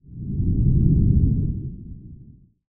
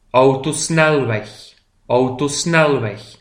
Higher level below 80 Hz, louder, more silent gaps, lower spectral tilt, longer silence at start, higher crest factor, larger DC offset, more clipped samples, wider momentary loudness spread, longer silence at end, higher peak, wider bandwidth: first, -26 dBFS vs -50 dBFS; second, -21 LUFS vs -16 LUFS; neither; first, -20.5 dB/octave vs -4.5 dB/octave; about the same, 0.1 s vs 0.15 s; about the same, 16 dB vs 16 dB; neither; neither; first, 21 LU vs 9 LU; first, 0.55 s vs 0.1 s; second, -4 dBFS vs 0 dBFS; second, 0.9 kHz vs 15.5 kHz